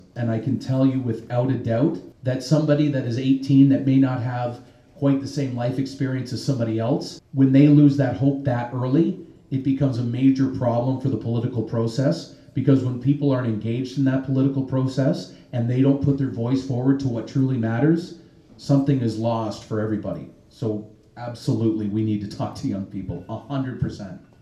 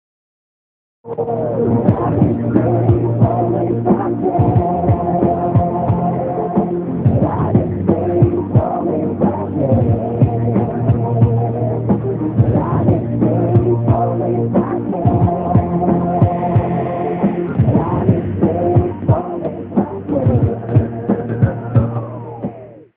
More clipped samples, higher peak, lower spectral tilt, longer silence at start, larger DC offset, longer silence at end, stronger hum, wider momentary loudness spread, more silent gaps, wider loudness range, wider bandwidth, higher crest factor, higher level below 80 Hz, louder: neither; second, -4 dBFS vs 0 dBFS; second, -8.5 dB/octave vs -11 dB/octave; second, 0.15 s vs 1.05 s; neither; about the same, 0.25 s vs 0.15 s; neither; first, 11 LU vs 5 LU; neither; first, 7 LU vs 2 LU; first, 10.5 kHz vs 3.4 kHz; about the same, 18 dB vs 16 dB; second, -54 dBFS vs -36 dBFS; second, -22 LUFS vs -16 LUFS